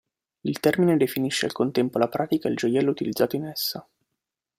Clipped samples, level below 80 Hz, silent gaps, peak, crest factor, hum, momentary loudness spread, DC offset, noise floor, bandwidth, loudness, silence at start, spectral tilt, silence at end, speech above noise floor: under 0.1%; -64 dBFS; none; -6 dBFS; 20 dB; none; 8 LU; under 0.1%; -84 dBFS; 16 kHz; -24 LUFS; 0.45 s; -5.5 dB/octave; 0.75 s; 60 dB